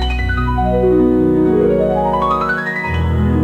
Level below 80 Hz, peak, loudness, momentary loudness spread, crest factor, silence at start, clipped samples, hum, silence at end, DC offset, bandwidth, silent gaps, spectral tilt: -24 dBFS; -4 dBFS; -15 LUFS; 5 LU; 10 dB; 0 s; under 0.1%; none; 0 s; under 0.1%; 8.4 kHz; none; -8.5 dB/octave